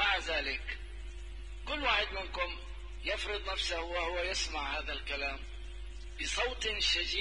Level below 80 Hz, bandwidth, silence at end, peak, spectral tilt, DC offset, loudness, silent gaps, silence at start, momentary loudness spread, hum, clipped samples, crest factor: -44 dBFS; 10.5 kHz; 0 s; -16 dBFS; -2 dB/octave; 0.2%; -34 LUFS; none; 0 s; 17 LU; none; under 0.1%; 20 dB